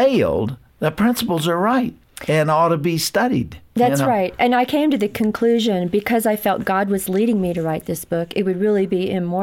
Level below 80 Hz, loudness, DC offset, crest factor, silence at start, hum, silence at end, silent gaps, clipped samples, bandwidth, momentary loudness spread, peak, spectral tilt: -50 dBFS; -19 LUFS; under 0.1%; 12 dB; 0 s; none; 0 s; none; under 0.1%; 17 kHz; 7 LU; -6 dBFS; -5.5 dB/octave